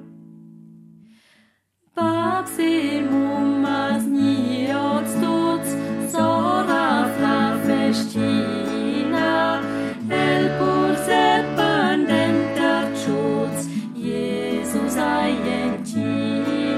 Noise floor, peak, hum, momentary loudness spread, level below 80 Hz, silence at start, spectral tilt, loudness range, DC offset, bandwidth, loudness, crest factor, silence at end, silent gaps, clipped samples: -65 dBFS; -6 dBFS; none; 6 LU; -56 dBFS; 0 s; -5 dB/octave; 4 LU; under 0.1%; 15 kHz; -21 LUFS; 16 dB; 0 s; none; under 0.1%